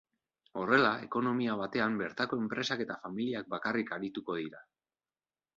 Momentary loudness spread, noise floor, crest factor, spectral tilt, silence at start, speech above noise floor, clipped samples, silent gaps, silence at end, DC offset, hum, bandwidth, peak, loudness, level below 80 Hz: 11 LU; under -90 dBFS; 24 dB; -5.5 dB/octave; 0.55 s; over 57 dB; under 0.1%; none; 0.95 s; under 0.1%; none; 7.6 kHz; -12 dBFS; -33 LUFS; -74 dBFS